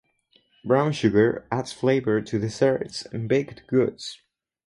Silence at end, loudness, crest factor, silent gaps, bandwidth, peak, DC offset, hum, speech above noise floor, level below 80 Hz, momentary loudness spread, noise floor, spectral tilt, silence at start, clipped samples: 0.5 s; -24 LUFS; 18 dB; none; 11.5 kHz; -6 dBFS; under 0.1%; none; 41 dB; -58 dBFS; 11 LU; -64 dBFS; -6.5 dB/octave; 0.65 s; under 0.1%